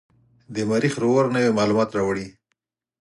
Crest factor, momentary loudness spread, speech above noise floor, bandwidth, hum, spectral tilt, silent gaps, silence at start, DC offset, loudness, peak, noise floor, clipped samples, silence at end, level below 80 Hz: 16 dB; 11 LU; 56 dB; 11.5 kHz; none; -6 dB/octave; none; 0.5 s; under 0.1%; -21 LUFS; -8 dBFS; -77 dBFS; under 0.1%; 0.7 s; -58 dBFS